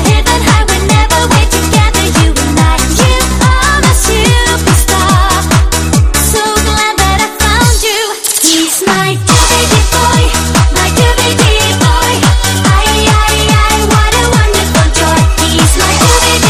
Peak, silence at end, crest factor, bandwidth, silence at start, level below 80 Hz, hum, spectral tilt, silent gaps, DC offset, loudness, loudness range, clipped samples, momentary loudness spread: 0 dBFS; 0 s; 8 dB; 16 kHz; 0 s; -14 dBFS; none; -3.5 dB/octave; none; under 0.1%; -8 LUFS; 1 LU; 0.5%; 2 LU